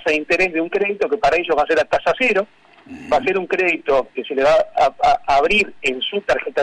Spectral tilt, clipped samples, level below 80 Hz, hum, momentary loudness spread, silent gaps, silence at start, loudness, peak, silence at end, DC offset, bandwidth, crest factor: -4 dB/octave; under 0.1%; -46 dBFS; none; 5 LU; none; 0 s; -17 LUFS; -8 dBFS; 0 s; under 0.1%; 10.5 kHz; 10 dB